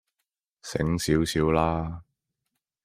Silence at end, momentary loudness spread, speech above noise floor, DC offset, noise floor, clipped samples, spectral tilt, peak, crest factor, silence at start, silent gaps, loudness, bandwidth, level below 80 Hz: 0.85 s; 16 LU; 59 dB; under 0.1%; -83 dBFS; under 0.1%; -5.5 dB/octave; -8 dBFS; 20 dB; 0.65 s; none; -26 LUFS; 15.5 kHz; -46 dBFS